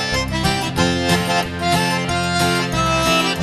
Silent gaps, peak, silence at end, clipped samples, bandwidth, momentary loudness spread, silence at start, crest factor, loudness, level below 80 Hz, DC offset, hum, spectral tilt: none; -2 dBFS; 0 s; under 0.1%; 13 kHz; 3 LU; 0 s; 16 dB; -18 LUFS; -34 dBFS; under 0.1%; none; -4 dB/octave